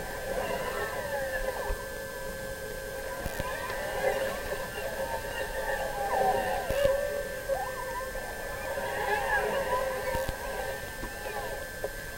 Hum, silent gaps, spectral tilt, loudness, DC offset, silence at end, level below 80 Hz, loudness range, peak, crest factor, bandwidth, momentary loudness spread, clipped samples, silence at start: none; none; -3.5 dB/octave; -32 LUFS; under 0.1%; 0 s; -44 dBFS; 4 LU; -12 dBFS; 22 dB; 16 kHz; 9 LU; under 0.1%; 0 s